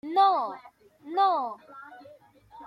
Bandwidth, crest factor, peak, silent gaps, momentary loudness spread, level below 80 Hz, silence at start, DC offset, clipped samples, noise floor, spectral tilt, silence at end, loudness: 5.6 kHz; 18 dB; -12 dBFS; none; 24 LU; -78 dBFS; 0.05 s; under 0.1%; under 0.1%; -54 dBFS; -4.5 dB/octave; 0 s; -26 LUFS